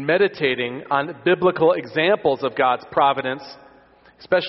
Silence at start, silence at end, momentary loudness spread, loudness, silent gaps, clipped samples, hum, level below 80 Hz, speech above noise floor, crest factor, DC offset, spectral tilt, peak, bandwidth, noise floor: 0 s; 0 s; 7 LU; -20 LUFS; none; under 0.1%; none; -62 dBFS; 32 dB; 16 dB; under 0.1%; -3 dB/octave; -4 dBFS; 6 kHz; -52 dBFS